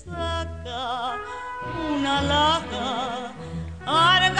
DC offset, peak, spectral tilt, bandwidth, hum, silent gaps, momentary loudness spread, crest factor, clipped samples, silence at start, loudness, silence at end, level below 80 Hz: 0.3%; -6 dBFS; -4 dB/octave; 10 kHz; none; none; 14 LU; 18 dB; under 0.1%; 0 s; -24 LUFS; 0 s; -42 dBFS